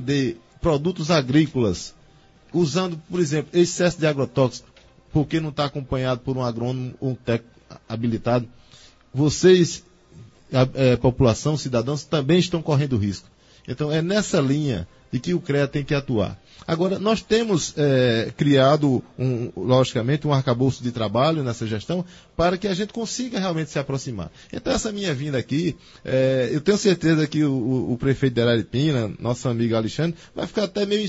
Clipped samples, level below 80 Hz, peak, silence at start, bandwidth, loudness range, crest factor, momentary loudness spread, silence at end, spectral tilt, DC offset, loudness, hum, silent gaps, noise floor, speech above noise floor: under 0.1%; -46 dBFS; -4 dBFS; 0 s; 8 kHz; 5 LU; 18 dB; 9 LU; 0 s; -6 dB/octave; under 0.1%; -22 LUFS; none; none; -53 dBFS; 31 dB